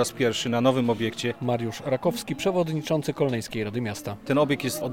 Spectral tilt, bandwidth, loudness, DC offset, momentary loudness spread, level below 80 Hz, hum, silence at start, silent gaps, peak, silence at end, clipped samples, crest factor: -5.5 dB/octave; 17 kHz; -26 LUFS; 0.2%; 7 LU; -60 dBFS; none; 0 s; none; -8 dBFS; 0 s; under 0.1%; 18 dB